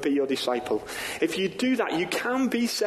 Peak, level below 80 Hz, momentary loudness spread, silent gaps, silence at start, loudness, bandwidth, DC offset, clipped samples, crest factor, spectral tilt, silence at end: -12 dBFS; -62 dBFS; 4 LU; none; 0 s; -27 LUFS; 13 kHz; under 0.1%; under 0.1%; 14 dB; -3.5 dB/octave; 0 s